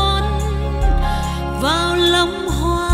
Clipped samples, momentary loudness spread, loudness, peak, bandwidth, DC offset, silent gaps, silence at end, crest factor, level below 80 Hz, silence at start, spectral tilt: under 0.1%; 7 LU; -18 LUFS; -4 dBFS; 16 kHz; under 0.1%; none; 0 s; 14 dB; -22 dBFS; 0 s; -5 dB/octave